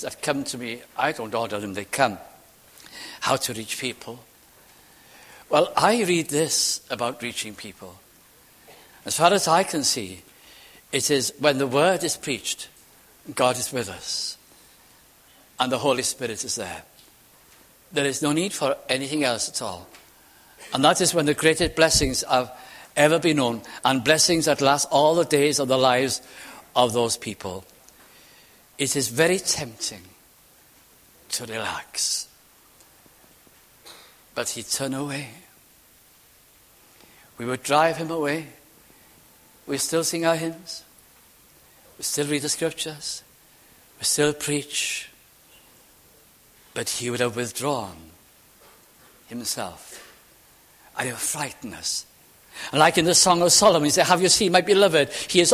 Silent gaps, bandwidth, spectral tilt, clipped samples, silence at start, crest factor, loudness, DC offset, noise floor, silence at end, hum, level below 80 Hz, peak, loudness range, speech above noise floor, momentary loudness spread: none; 16 kHz; -2.5 dB/octave; under 0.1%; 0 s; 24 dB; -22 LUFS; under 0.1%; -55 dBFS; 0 s; none; -52 dBFS; -2 dBFS; 11 LU; 32 dB; 18 LU